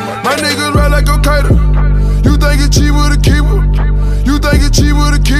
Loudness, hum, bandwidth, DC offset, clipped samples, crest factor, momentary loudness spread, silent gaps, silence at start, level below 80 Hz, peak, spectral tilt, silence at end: -11 LUFS; none; 14.5 kHz; under 0.1%; under 0.1%; 8 dB; 3 LU; none; 0 s; -10 dBFS; 0 dBFS; -5 dB/octave; 0 s